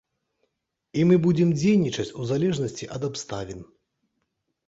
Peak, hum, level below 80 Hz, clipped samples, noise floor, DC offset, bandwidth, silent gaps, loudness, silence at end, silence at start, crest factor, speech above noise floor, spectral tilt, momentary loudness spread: -6 dBFS; none; -58 dBFS; under 0.1%; -78 dBFS; under 0.1%; 8 kHz; none; -24 LUFS; 1.05 s; 0.95 s; 18 dB; 55 dB; -6.5 dB/octave; 14 LU